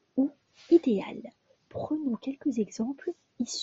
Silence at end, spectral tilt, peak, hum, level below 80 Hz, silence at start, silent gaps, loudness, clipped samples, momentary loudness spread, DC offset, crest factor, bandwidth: 0 s; -6 dB/octave; -10 dBFS; none; -72 dBFS; 0.15 s; none; -30 LUFS; under 0.1%; 17 LU; under 0.1%; 20 dB; 8 kHz